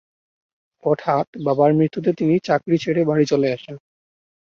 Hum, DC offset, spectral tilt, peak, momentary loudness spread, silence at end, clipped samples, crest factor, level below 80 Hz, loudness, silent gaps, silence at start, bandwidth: none; under 0.1%; -7.5 dB/octave; -4 dBFS; 7 LU; 0.65 s; under 0.1%; 18 dB; -62 dBFS; -19 LUFS; 1.27-1.33 s; 0.85 s; 7.2 kHz